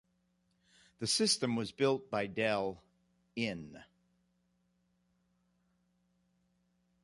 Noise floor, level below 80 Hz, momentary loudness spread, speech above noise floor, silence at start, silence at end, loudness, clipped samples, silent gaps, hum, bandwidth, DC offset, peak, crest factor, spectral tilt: -77 dBFS; -72 dBFS; 17 LU; 43 dB; 1 s; 3.2 s; -34 LUFS; under 0.1%; none; 60 Hz at -65 dBFS; 11.5 kHz; under 0.1%; -18 dBFS; 22 dB; -3.5 dB/octave